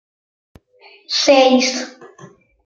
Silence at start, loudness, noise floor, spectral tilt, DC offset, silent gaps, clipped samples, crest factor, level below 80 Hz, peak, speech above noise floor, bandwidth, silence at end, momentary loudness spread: 1.1 s; -14 LUFS; -44 dBFS; -1.5 dB/octave; under 0.1%; none; under 0.1%; 18 dB; -64 dBFS; 0 dBFS; 30 dB; 7.8 kHz; 0.4 s; 15 LU